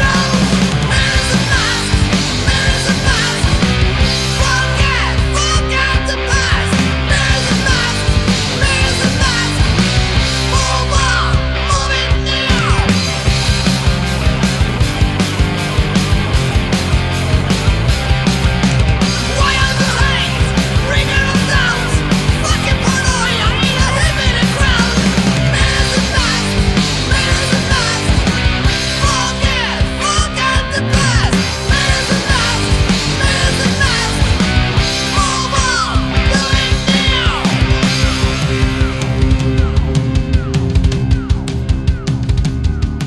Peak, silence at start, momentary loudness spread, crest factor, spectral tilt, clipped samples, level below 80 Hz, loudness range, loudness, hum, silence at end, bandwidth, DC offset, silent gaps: 0 dBFS; 0 s; 3 LU; 12 dB; -4 dB/octave; under 0.1%; -20 dBFS; 2 LU; -13 LUFS; none; 0 s; 12 kHz; under 0.1%; none